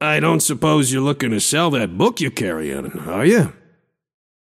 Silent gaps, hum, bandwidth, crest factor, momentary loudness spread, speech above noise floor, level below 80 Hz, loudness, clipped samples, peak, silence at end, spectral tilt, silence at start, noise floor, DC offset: none; none; 16 kHz; 16 dB; 9 LU; 42 dB; -52 dBFS; -18 LUFS; under 0.1%; -2 dBFS; 1.05 s; -4.5 dB/octave; 0 s; -59 dBFS; under 0.1%